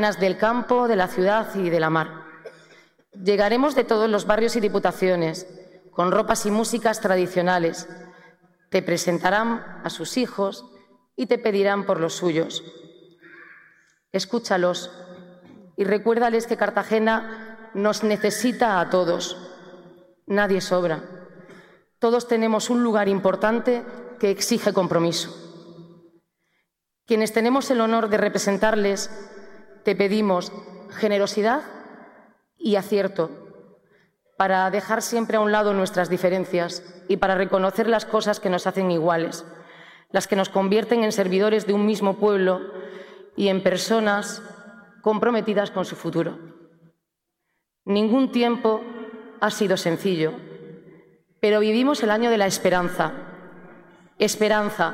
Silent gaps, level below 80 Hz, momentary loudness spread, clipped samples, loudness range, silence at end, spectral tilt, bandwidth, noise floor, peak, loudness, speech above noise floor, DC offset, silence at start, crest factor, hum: none; -58 dBFS; 15 LU; under 0.1%; 4 LU; 0 s; -4.5 dB/octave; 16.5 kHz; -79 dBFS; -6 dBFS; -22 LUFS; 58 dB; under 0.1%; 0 s; 18 dB; none